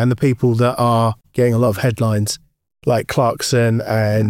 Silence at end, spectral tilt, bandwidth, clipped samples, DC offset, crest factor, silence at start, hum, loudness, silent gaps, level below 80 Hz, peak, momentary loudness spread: 0 s; -6 dB/octave; 16 kHz; under 0.1%; under 0.1%; 12 dB; 0 s; none; -17 LUFS; none; -48 dBFS; -6 dBFS; 5 LU